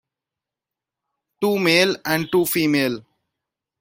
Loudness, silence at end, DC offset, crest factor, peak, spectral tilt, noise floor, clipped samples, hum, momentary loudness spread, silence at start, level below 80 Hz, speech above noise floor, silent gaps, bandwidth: -19 LUFS; 0.8 s; under 0.1%; 20 dB; -2 dBFS; -4 dB/octave; -87 dBFS; under 0.1%; none; 9 LU; 1.4 s; -64 dBFS; 68 dB; none; 16.5 kHz